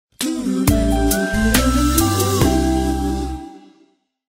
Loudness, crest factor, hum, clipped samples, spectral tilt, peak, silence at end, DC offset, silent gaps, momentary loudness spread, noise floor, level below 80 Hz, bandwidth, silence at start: -18 LUFS; 16 dB; none; under 0.1%; -5 dB/octave; -2 dBFS; 0.7 s; under 0.1%; none; 8 LU; -57 dBFS; -24 dBFS; 16.5 kHz; 0.2 s